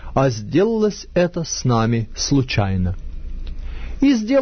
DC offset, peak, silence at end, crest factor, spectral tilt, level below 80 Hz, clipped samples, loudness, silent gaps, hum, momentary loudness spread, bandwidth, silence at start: under 0.1%; -4 dBFS; 0 s; 14 dB; -5.5 dB/octave; -32 dBFS; under 0.1%; -19 LUFS; none; none; 16 LU; 6.6 kHz; 0 s